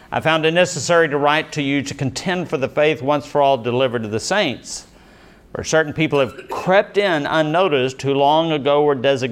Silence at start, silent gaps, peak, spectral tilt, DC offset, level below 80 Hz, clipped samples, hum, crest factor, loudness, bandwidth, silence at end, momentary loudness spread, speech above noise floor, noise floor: 0.1 s; none; -2 dBFS; -4.5 dB/octave; under 0.1%; -54 dBFS; under 0.1%; none; 16 dB; -18 LUFS; 14.5 kHz; 0 s; 7 LU; 28 dB; -46 dBFS